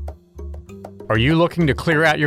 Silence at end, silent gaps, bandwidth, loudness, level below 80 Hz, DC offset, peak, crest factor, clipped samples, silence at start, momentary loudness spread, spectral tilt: 0 s; none; 14 kHz; -17 LUFS; -36 dBFS; under 0.1%; -6 dBFS; 14 dB; under 0.1%; 0 s; 21 LU; -6.5 dB/octave